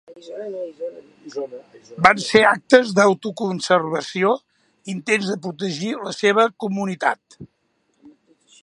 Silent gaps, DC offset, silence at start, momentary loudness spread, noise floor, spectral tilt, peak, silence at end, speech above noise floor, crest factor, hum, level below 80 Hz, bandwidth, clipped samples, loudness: none; under 0.1%; 0.1 s; 18 LU; -67 dBFS; -4.5 dB/octave; 0 dBFS; 0.55 s; 47 dB; 20 dB; none; -60 dBFS; 11.5 kHz; under 0.1%; -19 LUFS